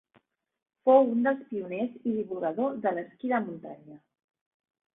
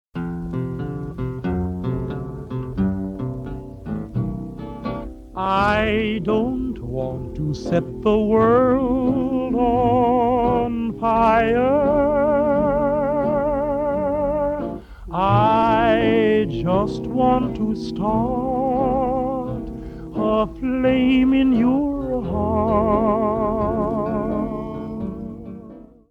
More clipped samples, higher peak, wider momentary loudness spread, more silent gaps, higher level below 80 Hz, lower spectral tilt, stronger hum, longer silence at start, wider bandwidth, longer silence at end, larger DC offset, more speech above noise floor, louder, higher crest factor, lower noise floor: neither; second, -8 dBFS vs -4 dBFS; first, 16 LU vs 13 LU; neither; second, -76 dBFS vs -38 dBFS; first, -10.5 dB/octave vs -8.5 dB/octave; neither; first, 0.85 s vs 0.15 s; second, 3.8 kHz vs 7.4 kHz; first, 1 s vs 0.3 s; neither; first, 41 dB vs 23 dB; second, -28 LUFS vs -20 LUFS; first, 22 dB vs 16 dB; first, -68 dBFS vs -41 dBFS